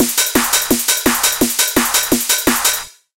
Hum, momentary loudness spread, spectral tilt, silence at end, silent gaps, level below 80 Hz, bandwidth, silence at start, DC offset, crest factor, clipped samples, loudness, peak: none; 1 LU; -1 dB/octave; 0.3 s; none; -40 dBFS; 17.5 kHz; 0 s; 0.1%; 16 dB; under 0.1%; -13 LUFS; 0 dBFS